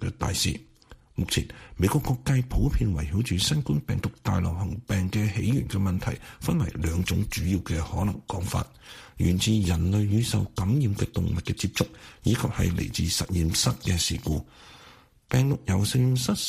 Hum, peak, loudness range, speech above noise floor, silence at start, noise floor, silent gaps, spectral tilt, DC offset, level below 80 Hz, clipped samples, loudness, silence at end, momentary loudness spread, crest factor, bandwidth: none; -8 dBFS; 2 LU; 28 dB; 0 s; -53 dBFS; none; -5 dB/octave; under 0.1%; -38 dBFS; under 0.1%; -27 LUFS; 0 s; 7 LU; 18 dB; 15.5 kHz